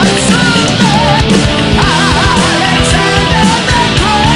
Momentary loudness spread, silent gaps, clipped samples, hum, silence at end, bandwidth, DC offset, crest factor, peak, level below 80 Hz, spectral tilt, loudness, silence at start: 1 LU; none; 0.2%; none; 0 s; 13.5 kHz; under 0.1%; 8 dB; 0 dBFS; -22 dBFS; -4 dB/octave; -8 LUFS; 0 s